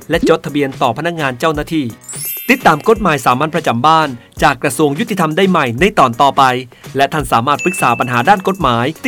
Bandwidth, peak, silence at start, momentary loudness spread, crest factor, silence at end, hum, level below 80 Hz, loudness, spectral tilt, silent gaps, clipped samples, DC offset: over 20 kHz; 0 dBFS; 0 s; 8 LU; 14 dB; 0 s; none; -38 dBFS; -13 LUFS; -5 dB/octave; none; 0.2%; under 0.1%